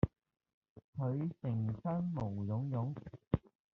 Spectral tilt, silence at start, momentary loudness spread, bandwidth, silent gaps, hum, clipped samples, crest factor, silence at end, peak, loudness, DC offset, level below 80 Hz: -10.5 dB/octave; 0.05 s; 4 LU; 4.1 kHz; 0.54-0.61 s, 0.69-0.76 s, 0.84-0.93 s, 3.27-3.31 s; none; under 0.1%; 22 dB; 0.35 s; -16 dBFS; -39 LUFS; under 0.1%; -58 dBFS